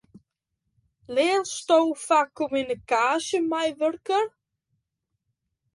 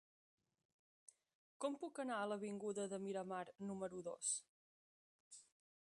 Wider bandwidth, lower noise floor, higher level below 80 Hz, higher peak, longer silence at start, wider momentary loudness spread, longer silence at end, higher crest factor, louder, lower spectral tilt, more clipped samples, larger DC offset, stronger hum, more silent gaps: about the same, 11.5 kHz vs 11.5 kHz; second, -80 dBFS vs under -90 dBFS; first, -68 dBFS vs under -90 dBFS; first, -8 dBFS vs -30 dBFS; second, 1.1 s vs 1.6 s; second, 6 LU vs 14 LU; first, 1.45 s vs 0.45 s; about the same, 18 dB vs 20 dB; first, -24 LUFS vs -46 LUFS; about the same, -2.5 dB/octave vs -3.5 dB/octave; neither; neither; neither; second, none vs 4.49-5.31 s